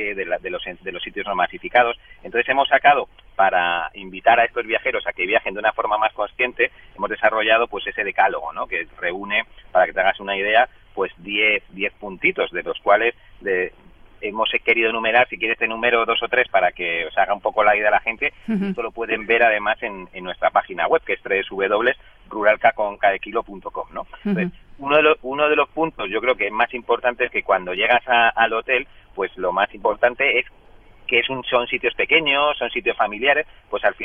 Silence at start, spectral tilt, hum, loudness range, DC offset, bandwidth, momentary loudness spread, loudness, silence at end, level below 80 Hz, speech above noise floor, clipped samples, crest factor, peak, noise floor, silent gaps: 0 s; -7 dB/octave; none; 2 LU; under 0.1%; 4.1 kHz; 11 LU; -20 LUFS; 0 s; -50 dBFS; 26 dB; under 0.1%; 18 dB; -4 dBFS; -46 dBFS; none